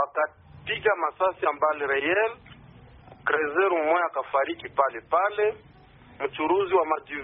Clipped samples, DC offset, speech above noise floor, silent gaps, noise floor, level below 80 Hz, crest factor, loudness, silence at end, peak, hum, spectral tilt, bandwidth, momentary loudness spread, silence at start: under 0.1%; under 0.1%; 27 dB; none; -52 dBFS; -62 dBFS; 18 dB; -25 LUFS; 0 s; -8 dBFS; none; -2 dB/octave; 3.9 kHz; 9 LU; 0 s